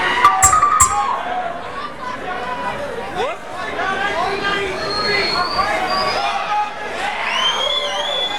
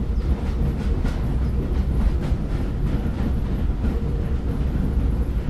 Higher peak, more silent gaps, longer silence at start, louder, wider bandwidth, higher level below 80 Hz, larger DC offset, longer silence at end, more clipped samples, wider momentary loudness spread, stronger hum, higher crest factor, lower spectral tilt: first, 0 dBFS vs -8 dBFS; neither; about the same, 0 s vs 0 s; first, -18 LUFS vs -25 LUFS; first, over 20 kHz vs 12 kHz; second, -42 dBFS vs -22 dBFS; first, 2% vs under 0.1%; about the same, 0 s vs 0 s; neither; first, 14 LU vs 2 LU; neither; first, 18 dB vs 12 dB; second, -1 dB/octave vs -8.5 dB/octave